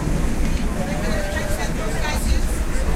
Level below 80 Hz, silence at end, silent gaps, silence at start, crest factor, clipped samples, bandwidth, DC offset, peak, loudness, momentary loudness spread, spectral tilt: -22 dBFS; 0 s; none; 0 s; 14 dB; under 0.1%; 15.5 kHz; under 0.1%; -6 dBFS; -24 LUFS; 2 LU; -5 dB/octave